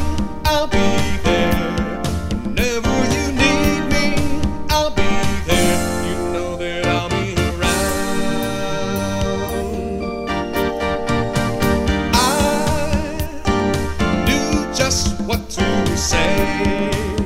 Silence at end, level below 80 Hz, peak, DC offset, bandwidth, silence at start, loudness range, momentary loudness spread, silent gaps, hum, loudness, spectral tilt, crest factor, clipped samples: 0 s; -28 dBFS; 0 dBFS; under 0.1%; 16 kHz; 0 s; 3 LU; 7 LU; none; none; -19 LUFS; -4.5 dB/octave; 18 dB; under 0.1%